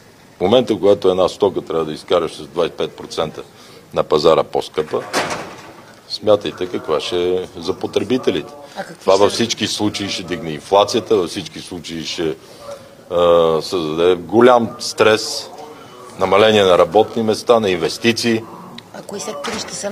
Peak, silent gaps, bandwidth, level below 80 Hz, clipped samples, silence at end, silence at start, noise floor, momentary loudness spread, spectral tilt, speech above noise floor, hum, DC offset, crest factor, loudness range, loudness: 0 dBFS; none; 15.5 kHz; -54 dBFS; under 0.1%; 0 s; 0.4 s; -40 dBFS; 18 LU; -4 dB/octave; 23 dB; none; under 0.1%; 18 dB; 5 LU; -17 LUFS